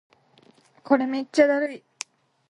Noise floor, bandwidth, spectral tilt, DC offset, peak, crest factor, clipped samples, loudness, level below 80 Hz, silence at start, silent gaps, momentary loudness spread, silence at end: -58 dBFS; 11.5 kHz; -3.5 dB/octave; under 0.1%; -4 dBFS; 22 dB; under 0.1%; -23 LUFS; -74 dBFS; 0.9 s; none; 18 LU; 0.75 s